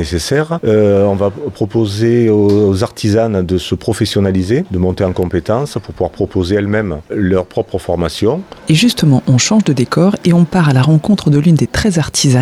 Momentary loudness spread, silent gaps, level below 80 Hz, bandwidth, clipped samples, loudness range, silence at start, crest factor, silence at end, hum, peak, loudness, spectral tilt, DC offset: 7 LU; none; -36 dBFS; 13.5 kHz; under 0.1%; 5 LU; 0 s; 10 dB; 0 s; none; -2 dBFS; -13 LUFS; -6 dB/octave; under 0.1%